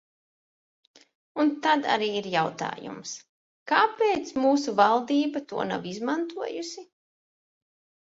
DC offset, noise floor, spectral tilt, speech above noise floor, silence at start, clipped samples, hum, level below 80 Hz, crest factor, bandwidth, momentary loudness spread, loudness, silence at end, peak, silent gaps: under 0.1%; under -90 dBFS; -4 dB/octave; over 64 dB; 1.35 s; under 0.1%; none; -72 dBFS; 22 dB; 8 kHz; 16 LU; -26 LUFS; 1.15 s; -6 dBFS; 3.29-3.66 s